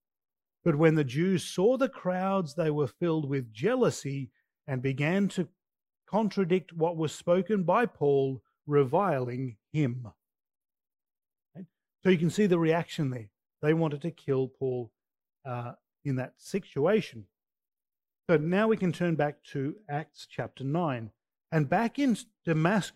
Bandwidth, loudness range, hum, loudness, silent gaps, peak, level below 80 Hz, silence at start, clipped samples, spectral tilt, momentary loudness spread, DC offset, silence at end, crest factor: 12.5 kHz; 5 LU; none; -29 LUFS; none; -10 dBFS; -70 dBFS; 0.65 s; under 0.1%; -7 dB/octave; 13 LU; under 0.1%; 0.05 s; 20 dB